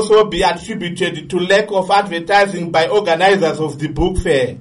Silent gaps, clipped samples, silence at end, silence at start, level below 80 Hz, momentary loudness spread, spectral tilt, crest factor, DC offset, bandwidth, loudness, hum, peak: none; under 0.1%; 0 s; 0 s; -32 dBFS; 8 LU; -5 dB/octave; 12 dB; under 0.1%; 11.5 kHz; -15 LUFS; none; -2 dBFS